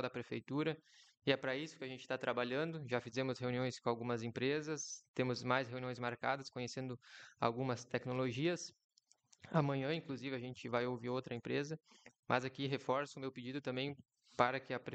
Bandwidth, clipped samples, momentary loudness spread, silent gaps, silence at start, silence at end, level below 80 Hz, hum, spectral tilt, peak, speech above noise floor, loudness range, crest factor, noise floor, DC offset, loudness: 8.8 kHz; under 0.1%; 9 LU; 5.08-5.14 s, 8.84-8.89 s, 12.19-12.23 s; 0 s; 0 s; -80 dBFS; none; -5.5 dB/octave; -16 dBFS; 32 dB; 2 LU; 24 dB; -72 dBFS; under 0.1%; -40 LUFS